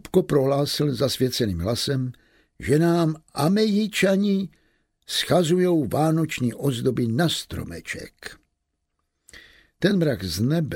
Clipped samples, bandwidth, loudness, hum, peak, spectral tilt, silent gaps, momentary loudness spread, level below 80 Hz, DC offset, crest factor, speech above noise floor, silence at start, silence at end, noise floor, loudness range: under 0.1%; 16.5 kHz; -23 LUFS; none; -6 dBFS; -5.5 dB/octave; none; 13 LU; -50 dBFS; under 0.1%; 16 dB; 55 dB; 0.05 s; 0 s; -77 dBFS; 6 LU